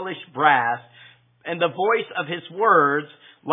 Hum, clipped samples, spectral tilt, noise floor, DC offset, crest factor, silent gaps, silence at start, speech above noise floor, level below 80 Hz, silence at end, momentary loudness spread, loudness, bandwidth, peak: none; under 0.1%; -8.5 dB/octave; -51 dBFS; under 0.1%; 20 dB; none; 0 s; 30 dB; -82 dBFS; 0 s; 16 LU; -21 LUFS; 3.9 kHz; -2 dBFS